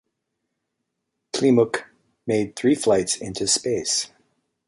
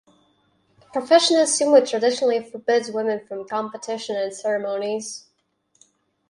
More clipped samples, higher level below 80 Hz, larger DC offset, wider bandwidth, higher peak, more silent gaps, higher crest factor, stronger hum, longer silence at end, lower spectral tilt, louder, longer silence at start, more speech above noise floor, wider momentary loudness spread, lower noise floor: neither; first, -60 dBFS vs -74 dBFS; neither; about the same, 11.5 kHz vs 11.5 kHz; second, -6 dBFS vs -2 dBFS; neither; about the same, 18 dB vs 20 dB; neither; second, 0.6 s vs 1.1 s; first, -3.5 dB/octave vs -2 dB/octave; about the same, -22 LUFS vs -21 LUFS; first, 1.35 s vs 0.95 s; first, 58 dB vs 47 dB; about the same, 12 LU vs 14 LU; first, -79 dBFS vs -68 dBFS